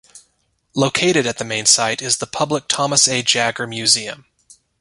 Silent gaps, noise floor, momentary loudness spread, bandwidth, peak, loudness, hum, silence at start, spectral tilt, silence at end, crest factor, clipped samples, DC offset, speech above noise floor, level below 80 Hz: none; -65 dBFS; 8 LU; 11.5 kHz; 0 dBFS; -16 LUFS; none; 0.15 s; -2 dB/octave; 0.65 s; 20 dB; under 0.1%; under 0.1%; 47 dB; -58 dBFS